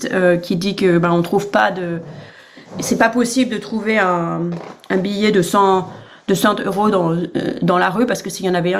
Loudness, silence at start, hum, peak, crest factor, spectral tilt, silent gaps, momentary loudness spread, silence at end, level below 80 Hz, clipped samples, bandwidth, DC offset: -17 LUFS; 0 s; none; 0 dBFS; 16 dB; -5.5 dB/octave; none; 11 LU; 0 s; -54 dBFS; under 0.1%; 15.5 kHz; under 0.1%